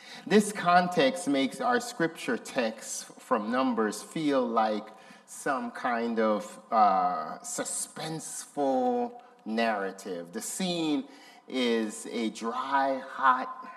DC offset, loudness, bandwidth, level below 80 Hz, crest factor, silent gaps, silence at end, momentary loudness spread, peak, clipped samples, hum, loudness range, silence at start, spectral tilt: under 0.1%; -29 LUFS; 14.5 kHz; -82 dBFS; 20 dB; none; 0 s; 12 LU; -10 dBFS; under 0.1%; none; 4 LU; 0 s; -4 dB/octave